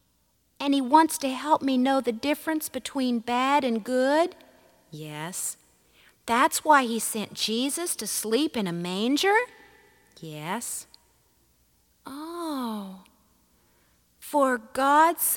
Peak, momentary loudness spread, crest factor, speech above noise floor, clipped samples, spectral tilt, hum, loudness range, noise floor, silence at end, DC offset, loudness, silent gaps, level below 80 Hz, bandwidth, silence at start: -4 dBFS; 17 LU; 22 dB; 43 dB; under 0.1%; -3 dB/octave; none; 12 LU; -68 dBFS; 0 s; under 0.1%; -25 LUFS; none; -68 dBFS; 19 kHz; 0.6 s